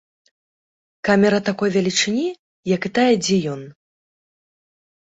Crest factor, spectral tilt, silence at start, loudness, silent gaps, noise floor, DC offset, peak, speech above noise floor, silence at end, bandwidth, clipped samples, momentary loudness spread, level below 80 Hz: 18 dB; -4.5 dB/octave; 1.05 s; -19 LUFS; 2.39-2.63 s; under -90 dBFS; under 0.1%; -2 dBFS; over 72 dB; 1.45 s; 8.2 kHz; under 0.1%; 12 LU; -60 dBFS